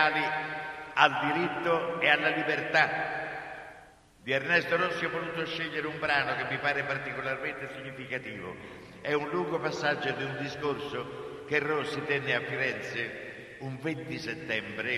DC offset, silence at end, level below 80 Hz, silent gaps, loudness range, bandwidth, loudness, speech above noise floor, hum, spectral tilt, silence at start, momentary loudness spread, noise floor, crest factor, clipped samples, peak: under 0.1%; 0 s; -66 dBFS; none; 6 LU; 13 kHz; -30 LUFS; 24 dB; none; -5 dB/octave; 0 s; 15 LU; -55 dBFS; 26 dB; under 0.1%; -6 dBFS